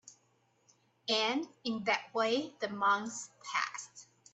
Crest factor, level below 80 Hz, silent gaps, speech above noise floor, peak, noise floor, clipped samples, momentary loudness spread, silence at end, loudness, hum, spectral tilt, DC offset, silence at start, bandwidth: 22 dB; -84 dBFS; none; 39 dB; -14 dBFS; -73 dBFS; under 0.1%; 13 LU; 0.3 s; -34 LUFS; none; -2.5 dB/octave; under 0.1%; 0.05 s; 8.6 kHz